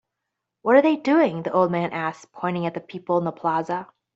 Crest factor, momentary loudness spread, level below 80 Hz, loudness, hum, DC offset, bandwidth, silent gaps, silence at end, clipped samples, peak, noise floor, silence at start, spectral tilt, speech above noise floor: 20 dB; 12 LU; -70 dBFS; -23 LUFS; none; under 0.1%; 7.8 kHz; none; 0.3 s; under 0.1%; -4 dBFS; -82 dBFS; 0.65 s; -7.5 dB/octave; 60 dB